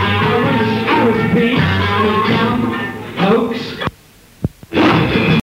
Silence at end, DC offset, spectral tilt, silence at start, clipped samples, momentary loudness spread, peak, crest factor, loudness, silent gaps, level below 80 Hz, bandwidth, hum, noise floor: 0.1 s; under 0.1%; -7 dB/octave; 0 s; under 0.1%; 10 LU; 0 dBFS; 14 dB; -15 LUFS; none; -40 dBFS; 16 kHz; none; -44 dBFS